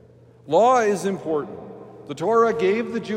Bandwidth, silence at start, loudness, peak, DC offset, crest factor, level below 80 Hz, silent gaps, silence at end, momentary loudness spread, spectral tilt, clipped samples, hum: 15 kHz; 0.45 s; -21 LUFS; -6 dBFS; under 0.1%; 16 dB; -66 dBFS; none; 0 s; 20 LU; -5.5 dB/octave; under 0.1%; none